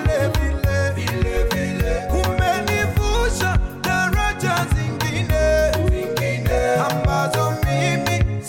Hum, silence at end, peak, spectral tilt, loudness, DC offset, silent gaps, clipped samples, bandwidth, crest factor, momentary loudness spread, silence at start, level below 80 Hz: none; 0 s; -8 dBFS; -5.5 dB/octave; -20 LUFS; 0.2%; none; under 0.1%; 17 kHz; 10 dB; 3 LU; 0 s; -26 dBFS